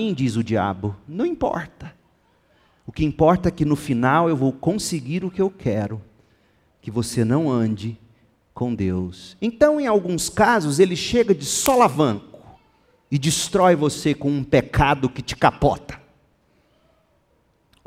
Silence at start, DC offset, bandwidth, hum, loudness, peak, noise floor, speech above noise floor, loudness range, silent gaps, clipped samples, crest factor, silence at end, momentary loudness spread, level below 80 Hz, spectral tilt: 0 s; under 0.1%; 16.5 kHz; none; -21 LUFS; -2 dBFS; -63 dBFS; 43 dB; 6 LU; none; under 0.1%; 20 dB; 1.9 s; 12 LU; -44 dBFS; -5.5 dB/octave